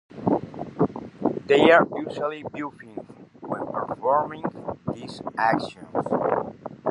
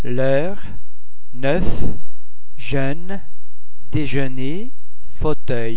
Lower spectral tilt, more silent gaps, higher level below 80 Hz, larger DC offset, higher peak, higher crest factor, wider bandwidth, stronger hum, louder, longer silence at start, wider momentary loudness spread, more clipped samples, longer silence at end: second, -6.5 dB/octave vs -10 dB/octave; neither; second, -60 dBFS vs -34 dBFS; second, under 0.1% vs 30%; about the same, -2 dBFS vs 0 dBFS; first, 24 dB vs 18 dB; first, 11 kHz vs 4 kHz; neither; about the same, -25 LUFS vs -24 LUFS; about the same, 0.1 s vs 0.05 s; second, 16 LU vs 19 LU; neither; about the same, 0 s vs 0 s